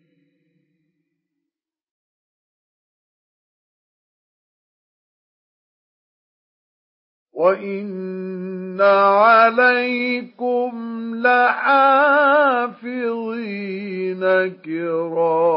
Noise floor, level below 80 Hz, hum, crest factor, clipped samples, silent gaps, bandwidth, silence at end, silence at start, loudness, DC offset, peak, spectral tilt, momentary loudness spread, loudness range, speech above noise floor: -84 dBFS; -84 dBFS; none; 18 dB; under 0.1%; none; 5.6 kHz; 0 s; 7.35 s; -17 LUFS; under 0.1%; -2 dBFS; -10 dB/octave; 15 LU; 11 LU; 67 dB